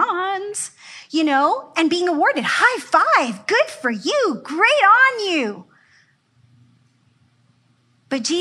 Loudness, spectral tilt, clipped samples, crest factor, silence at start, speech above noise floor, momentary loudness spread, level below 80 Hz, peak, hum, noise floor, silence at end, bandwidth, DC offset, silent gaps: -18 LUFS; -2.5 dB/octave; under 0.1%; 18 dB; 0 s; 43 dB; 14 LU; -82 dBFS; -2 dBFS; none; -60 dBFS; 0 s; 12.5 kHz; under 0.1%; none